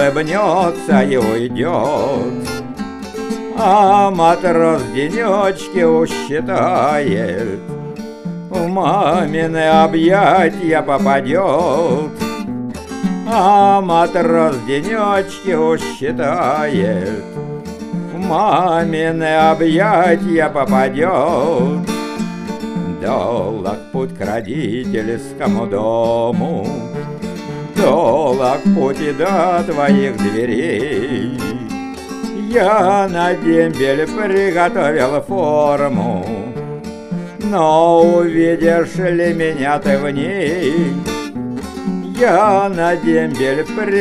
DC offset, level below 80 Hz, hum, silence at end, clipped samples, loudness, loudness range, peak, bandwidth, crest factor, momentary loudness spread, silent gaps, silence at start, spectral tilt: under 0.1%; -44 dBFS; none; 0 s; under 0.1%; -15 LUFS; 4 LU; 0 dBFS; 14 kHz; 14 dB; 12 LU; none; 0 s; -6.5 dB/octave